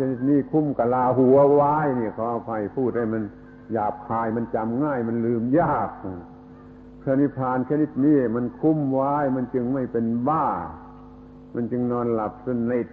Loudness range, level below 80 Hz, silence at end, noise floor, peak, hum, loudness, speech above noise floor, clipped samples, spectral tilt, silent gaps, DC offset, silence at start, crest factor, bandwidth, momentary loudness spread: 5 LU; -52 dBFS; 0 s; -44 dBFS; -8 dBFS; none; -23 LUFS; 22 dB; under 0.1%; -12 dB/octave; none; under 0.1%; 0 s; 16 dB; 4.1 kHz; 11 LU